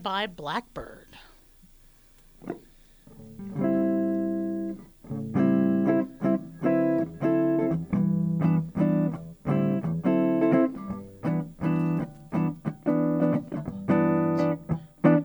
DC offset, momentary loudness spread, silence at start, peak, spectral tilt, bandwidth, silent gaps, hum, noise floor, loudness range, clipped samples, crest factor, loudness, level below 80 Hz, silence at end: under 0.1%; 14 LU; 0 s; -8 dBFS; -9 dB/octave; over 20 kHz; none; none; -55 dBFS; 7 LU; under 0.1%; 18 dB; -26 LUFS; -56 dBFS; 0 s